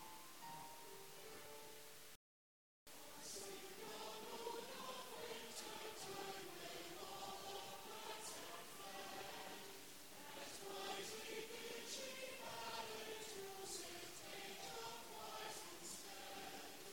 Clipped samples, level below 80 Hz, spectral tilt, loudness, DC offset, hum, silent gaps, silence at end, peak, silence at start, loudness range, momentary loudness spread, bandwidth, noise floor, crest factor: under 0.1%; -82 dBFS; -1.5 dB/octave; -52 LUFS; under 0.1%; none; 2.16-2.86 s; 0 s; -36 dBFS; 0 s; 5 LU; 7 LU; 17.5 kHz; under -90 dBFS; 18 dB